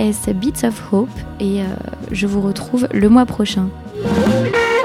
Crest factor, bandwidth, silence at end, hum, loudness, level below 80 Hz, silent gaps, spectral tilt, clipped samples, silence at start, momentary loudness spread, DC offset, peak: 16 dB; 15.5 kHz; 0 s; none; -17 LUFS; -36 dBFS; none; -6 dB/octave; under 0.1%; 0 s; 12 LU; under 0.1%; 0 dBFS